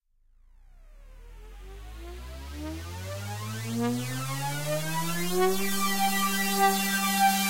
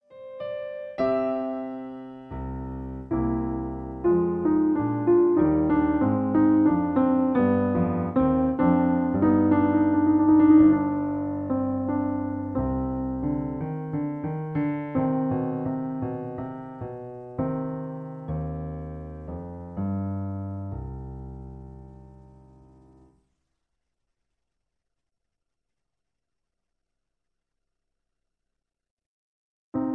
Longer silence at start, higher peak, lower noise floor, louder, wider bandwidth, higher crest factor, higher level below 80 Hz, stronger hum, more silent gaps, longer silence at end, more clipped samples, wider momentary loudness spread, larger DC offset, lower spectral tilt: about the same, 0 s vs 0.1 s; second, -12 dBFS vs -8 dBFS; second, -60 dBFS vs -85 dBFS; second, -28 LUFS vs -24 LUFS; first, 16 kHz vs 4.3 kHz; about the same, 16 dB vs 18 dB; about the same, -48 dBFS vs -46 dBFS; neither; second, none vs 28.91-28.97 s, 29.06-29.72 s; about the same, 0 s vs 0 s; neither; about the same, 19 LU vs 17 LU; neither; second, -3.5 dB/octave vs -12 dB/octave